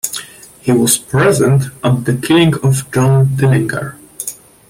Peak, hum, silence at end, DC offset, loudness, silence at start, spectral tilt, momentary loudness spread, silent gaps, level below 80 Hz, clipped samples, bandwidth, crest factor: 0 dBFS; none; 0.35 s; under 0.1%; -13 LUFS; 0.05 s; -5.5 dB/octave; 14 LU; none; -44 dBFS; under 0.1%; 16.5 kHz; 14 dB